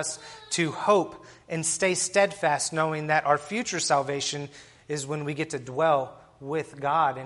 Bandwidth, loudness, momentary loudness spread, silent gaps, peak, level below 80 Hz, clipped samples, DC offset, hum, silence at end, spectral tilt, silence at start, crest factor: 11.5 kHz; -26 LUFS; 12 LU; none; -8 dBFS; -66 dBFS; under 0.1%; under 0.1%; none; 0 s; -3.5 dB/octave; 0 s; 20 dB